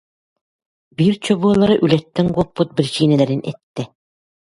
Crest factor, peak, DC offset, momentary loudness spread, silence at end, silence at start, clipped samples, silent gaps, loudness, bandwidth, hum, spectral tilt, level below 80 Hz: 18 dB; 0 dBFS; under 0.1%; 15 LU; 0.65 s; 1 s; under 0.1%; 3.63-3.74 s; -17 LUFS; 11.5 kHz; none; -7 dB/octave; -50 dBFS